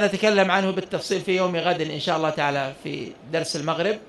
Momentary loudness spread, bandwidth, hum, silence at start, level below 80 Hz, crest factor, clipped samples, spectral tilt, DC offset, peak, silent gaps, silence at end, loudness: 10 LU; 12 kHz; none; 0 s; -62 dBFS; 18 dB; under 0.1%; -4.5 dB/octave; under 0.1%; -4 dBFS; none; 0 s; -23 LUFS